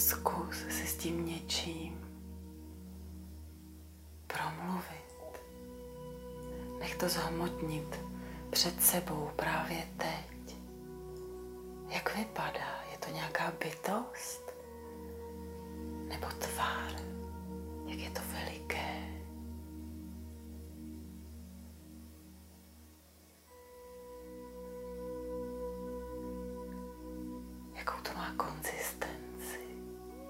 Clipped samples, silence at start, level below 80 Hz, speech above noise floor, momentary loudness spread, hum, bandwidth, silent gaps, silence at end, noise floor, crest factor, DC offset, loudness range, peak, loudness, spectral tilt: under 0.1%; 0 s; -54 dBFS; 24 dB; 16 LU; none; 16 kHz; none; 0 s; -61 dBFS; 28 dB; under 0.1%; 16 LU; -12 dBFS; -39 LUFS; -3.5 dB/octave